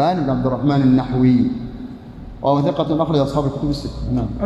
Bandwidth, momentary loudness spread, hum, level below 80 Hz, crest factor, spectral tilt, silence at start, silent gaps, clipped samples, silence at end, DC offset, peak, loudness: 8.6 kHz; 16 LU; none; -36 dBFS; 14 dB; -8.5 dB/octave; 0 s; none; under 0.1%; 0 s; under 0.1%; -4 dBFS; -18 LUFS